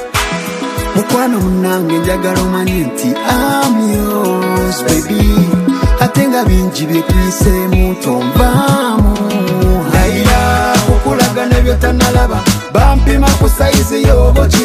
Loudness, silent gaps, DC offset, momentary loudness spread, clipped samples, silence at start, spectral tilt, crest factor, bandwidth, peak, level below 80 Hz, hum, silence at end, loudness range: -12 LUFS; none; under 0.1%; 4 LU; under 0.1%; 0 s; -5.5 dB/octave; 10 dB; 16 kHz; 0 dBFS; -16 dBFS; none; 0 s; 2 LU